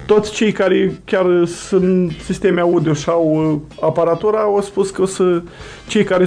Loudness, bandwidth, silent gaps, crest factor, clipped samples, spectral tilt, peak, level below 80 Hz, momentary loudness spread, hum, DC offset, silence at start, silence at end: -16 LUFS; 10.5 kHz; none; 14 dB; under 0.1%; -6 dB/octave; -2 dBFS; -44 dBFS; 5 LU; none; under 0.1%; 0 s; 0 s